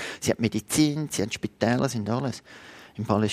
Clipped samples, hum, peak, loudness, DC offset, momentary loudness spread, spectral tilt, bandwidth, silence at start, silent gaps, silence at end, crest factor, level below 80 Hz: under 0.1%; none; -6 dBFS; -26 LUFS; under 0.1%; 17 LU; -5 dB/octave; 15.5 kHz; 0 s; none; 0 s; 20 dB; -58 dBFS